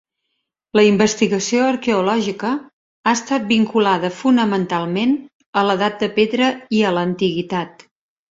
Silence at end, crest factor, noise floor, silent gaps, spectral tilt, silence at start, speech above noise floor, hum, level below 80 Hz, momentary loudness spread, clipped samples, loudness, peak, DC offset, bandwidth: 0.6 s; 18 dB; -75 dBFS; 2.73-3.03 s, 5.34-5.40 s, 5.46-5.53 s; -5 dB/octave; 0.75 s; 58 dB; none; -58 dBFS; 8 LU; under 0.1%; -18 LUFS; -2 dBFS; under 0.1%; 7.8 kHz